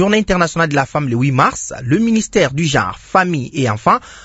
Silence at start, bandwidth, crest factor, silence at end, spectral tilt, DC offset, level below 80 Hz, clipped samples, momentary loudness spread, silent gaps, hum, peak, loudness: 0 s; 8 kHz; 16 dB; 0.05 s; -5 dB/octave; under 0.1%; -40 dBFS; under 0.1%; 4 LU; none; none; 0 dBFS; -15 LUFS